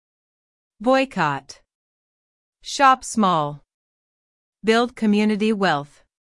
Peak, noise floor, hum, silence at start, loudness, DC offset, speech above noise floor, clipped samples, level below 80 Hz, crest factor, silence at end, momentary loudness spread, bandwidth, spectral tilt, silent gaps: -2 dBFS; under -90 dBFS; none; 0.8 s; -20 LUFS; under 0.1%; over 70 dB; under 0.1%; -60 dBFS; 20 dB; 0.4 s; 12 LU; 12 kHz; -5 dB/octave; 1.75-2.53 s, 3.74-4.53 s